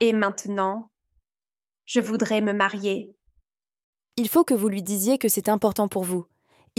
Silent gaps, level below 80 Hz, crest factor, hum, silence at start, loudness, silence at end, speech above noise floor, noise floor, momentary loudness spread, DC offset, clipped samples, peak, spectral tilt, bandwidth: 3.84-3.93 s; -68 dBFS; 18 dB; none; 0 s; -24 LUFS; 0.55 s; over 67 dB; under -90 dBFS; 8 LU; under 0.1%; under 0.1%; -6 dBFS; -4.5 dB/octave; 17 kHz